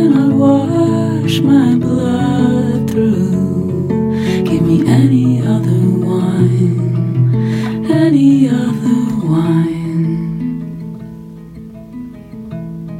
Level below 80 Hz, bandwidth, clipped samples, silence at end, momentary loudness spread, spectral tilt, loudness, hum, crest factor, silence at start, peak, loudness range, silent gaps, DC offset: -44 dBFS; 14.5 kHz; under 0.1%; 0 s; 18 LU; -8 dB/octave; -13 LUFS; none; 12 dB; 0 s; 0 dBFS; 5 LU; none; under 0.1%